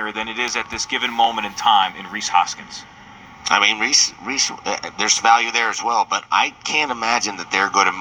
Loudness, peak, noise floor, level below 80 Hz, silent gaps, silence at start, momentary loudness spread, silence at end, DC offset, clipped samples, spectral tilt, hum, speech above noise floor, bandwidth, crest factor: -18 LUFS; 0 dBFS; -41 dBFS; -56 dBFS; none; 0 s; 10 LU; 0 s; under 0.1%; under 0.1%; 0 dB/octave; none; 22 dB; over 20 kHz; 20 dB